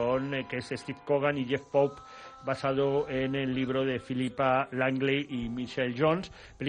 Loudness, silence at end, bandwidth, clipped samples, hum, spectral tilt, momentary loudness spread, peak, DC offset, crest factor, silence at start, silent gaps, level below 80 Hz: -30 LUFS; 0 s; 10 kHz; under 0.1%; none; -6.5 dB/octave; 8 LU; -12 dBFS; under 0.1%; 18 dB; 0 s; none; -58 dBFS